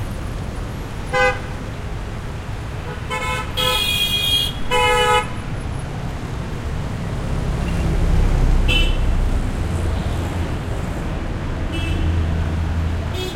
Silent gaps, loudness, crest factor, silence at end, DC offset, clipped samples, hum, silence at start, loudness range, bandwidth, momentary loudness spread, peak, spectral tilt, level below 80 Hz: none; -21 LUFS; 16 dB; 0 s; under 0.1%; under 0.1%; none; 0 s; 5 LU; 16.5 kHz; 12 LU; -4 dBFS; -4.5 dB/octave; -24 dBFS